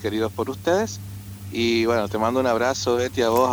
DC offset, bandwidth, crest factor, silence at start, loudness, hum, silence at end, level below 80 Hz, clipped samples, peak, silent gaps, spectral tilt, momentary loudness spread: under 0.1%; over 20 kHz; 16 dB; 0 s; -22 LUFS; none; 0 s; -52 dBFS; under 0.1%; -6 dBFS; none; -4.5 dB/octave; 11 LU